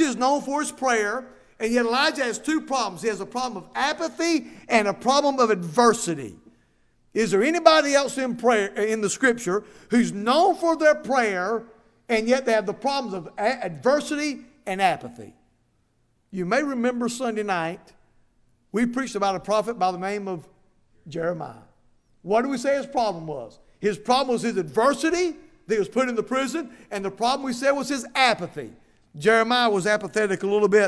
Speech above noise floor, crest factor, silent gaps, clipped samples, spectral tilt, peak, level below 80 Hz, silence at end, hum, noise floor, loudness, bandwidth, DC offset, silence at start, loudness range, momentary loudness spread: 43 dB; 24 dB; none; under 0.1%; -4 dB/octave; 0 dBFS; -60 dBFS; 0 s; none; -66 dBFS; -23 LUFS; 11 kHz; under 0.1%; 0 s; 6 LU; 12 LU